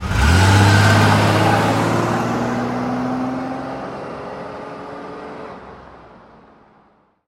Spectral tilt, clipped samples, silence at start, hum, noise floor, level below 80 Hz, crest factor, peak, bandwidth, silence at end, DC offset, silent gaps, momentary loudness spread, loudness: -5.5 dB/octave; under 0.1%; 0 s; none; -56 dBFS; -32 dBFS; 18 dB; 0 dBFS; 15.5 kHz; 1.2 s; under 0.1%; none; 20 LU; -16 LUFS